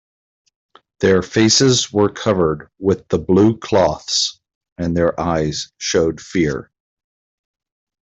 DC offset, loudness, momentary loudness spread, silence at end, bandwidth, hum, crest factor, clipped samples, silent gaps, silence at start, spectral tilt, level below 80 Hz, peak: under 0.1%; -17 LUFS; 9 LU; 1.4 s; 8.2 kHz; none; 16 dB; under 0.1%; 4.55-4.61 s, 4.72-4.76 s; 1 s; -4.5 dB/octave; -46 dBFS; -2 dBFS